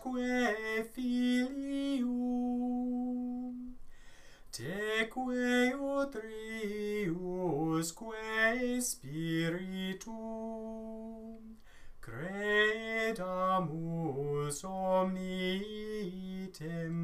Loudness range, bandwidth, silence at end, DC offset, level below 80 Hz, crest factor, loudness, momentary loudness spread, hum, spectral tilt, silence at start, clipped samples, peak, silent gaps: 3 LU; 15.5 kHz; 0 s; under 0.1%; -58 dBFS; 20 dB; -35 LUFS; 13 LU; none; -5 dB/octave; 0 s; under 0.1%; -16 dBFS; none